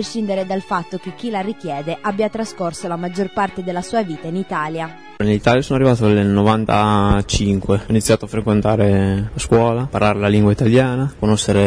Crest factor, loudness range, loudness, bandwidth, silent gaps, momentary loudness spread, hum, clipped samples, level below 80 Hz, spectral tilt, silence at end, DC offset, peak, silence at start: 14 dB; 7 LU; -18 LUFS; 11 kHz; none; 10 LU; none; under 0.1%; -36 dBFS; -6 dB/octave; 0 s; under 0.1%; -2 dBFS; 0 s